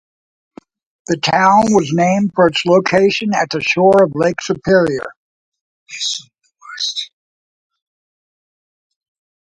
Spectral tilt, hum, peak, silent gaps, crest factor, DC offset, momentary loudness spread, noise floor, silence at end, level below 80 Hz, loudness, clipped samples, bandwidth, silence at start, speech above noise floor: -4.5 dB/octave; none; 0 dBFS; 5.16-5.52 s, 5.61-5.86 s; 16 dB; under 0.1%; 14 LU; under -90 dBFS; 2.5 s; -54 dBFS; -14 LUFS; under 0.1%; 11 kHz; 1.1 s; over 76 dB